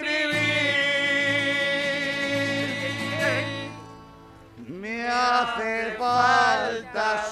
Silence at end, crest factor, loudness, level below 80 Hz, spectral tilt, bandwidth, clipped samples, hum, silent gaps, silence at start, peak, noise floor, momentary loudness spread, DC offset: 0 s; 18 dB; -23 LUFS; -58 dBFS; -3.5 dB/octave; 14.5 kHz; under 0.1%; none; none; 0 s; -8 dBFS; -47 dBFS; 11 LU; under 0.1%